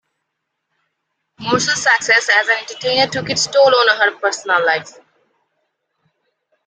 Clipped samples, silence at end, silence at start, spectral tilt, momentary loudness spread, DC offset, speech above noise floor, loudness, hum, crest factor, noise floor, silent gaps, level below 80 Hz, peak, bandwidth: under 0.1%; 1.75 s; 1.4 s; -2 dB/octave; 7 LU; under 0.1%; 60 dB; -14 LUFS; none; 18 dB; -75 dBFS; none; -60 dBFS; 0 dBFS; 9.6 kHz